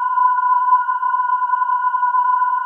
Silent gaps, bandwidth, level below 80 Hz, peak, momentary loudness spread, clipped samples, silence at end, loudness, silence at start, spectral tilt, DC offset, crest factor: none; 3.2 kHz; under -90 dBFS; -6 dBFS; 3 LU; under 0.1%; 0 s; -17 LUFS; 0 s; 4 dB/octave; under 0.1%; 12 dB